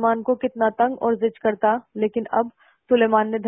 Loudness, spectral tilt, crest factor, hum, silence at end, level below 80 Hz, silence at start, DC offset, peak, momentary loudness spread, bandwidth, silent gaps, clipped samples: -22 LUFS; -10.5 dB/octave; 16 dB; none; 0 s; -64 dBFS; 0 s; under 0.1%; -4 dBFS; 6 LU; 3.6 kHz; none; under 0.1%